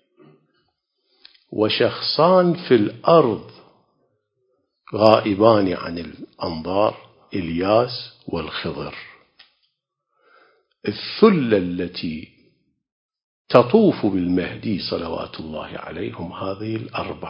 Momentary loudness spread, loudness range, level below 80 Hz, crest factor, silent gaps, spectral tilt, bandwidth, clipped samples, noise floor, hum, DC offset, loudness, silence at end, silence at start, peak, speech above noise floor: 16 LU; 7 LU; -50 dBFS; 22 dB; 12.92-13.09 s, 13.24-13.45 s; -8.5 dB/octave; 5.6 kHz; under 0.1%; -75 dBFS; none; under 0.1%; -20 LUFS; 0 s; 1.5 s; 0 dBFS; 56 dB